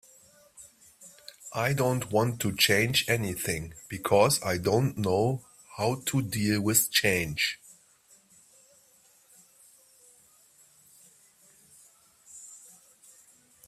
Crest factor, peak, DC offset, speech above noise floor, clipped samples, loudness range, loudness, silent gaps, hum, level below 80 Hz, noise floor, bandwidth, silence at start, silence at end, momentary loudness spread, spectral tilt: 22 dB; -8 dBFS; under 0.1%; 35 dB; under 0.1%; 4 LU; -26 LUFS; none; none; -60 dBFS; -62 dBFS; 16 kHz; 0.6 s; 1.1 s; 23 LU; -3.5 dB/octave